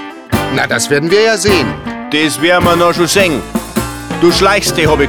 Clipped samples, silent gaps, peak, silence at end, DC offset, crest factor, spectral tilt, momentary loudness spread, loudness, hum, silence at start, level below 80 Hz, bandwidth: under 0.1%; none; 0 dBFS; 0 s; 0.3%; 12 dB; -4 dB/octave; 9 LU; -11 LUFS; none; 0 s; -32 dBFS; over 20 kHz